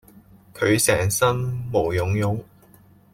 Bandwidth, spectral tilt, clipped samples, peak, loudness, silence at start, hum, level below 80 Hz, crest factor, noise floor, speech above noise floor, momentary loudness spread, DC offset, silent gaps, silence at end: 16.5 kHz; -4.5 dB/octave; under 0.1%; -6 dBFS; -22 LUFS; 0.55 s; none; -48 dBFS; 18 dB; -52 dBFS; 31 dB; 8 LU; under 0.1%; none; 0.7 s